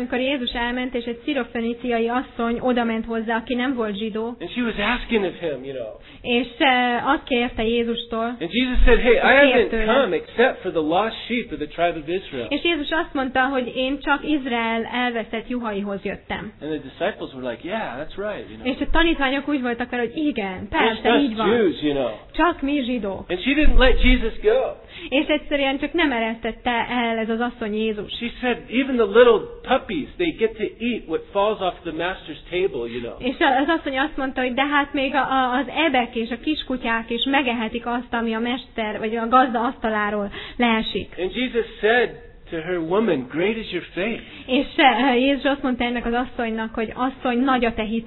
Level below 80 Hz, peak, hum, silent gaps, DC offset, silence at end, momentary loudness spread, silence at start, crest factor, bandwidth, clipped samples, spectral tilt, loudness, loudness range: -32 dBFS; -2 dBFS; none; none; under 0.1%; 0 s; 10 LU; 0 s; 18 dB; 4.2 kHz; under 0.1%; -8.5 dB/octave; -22 LUFS; 6 LU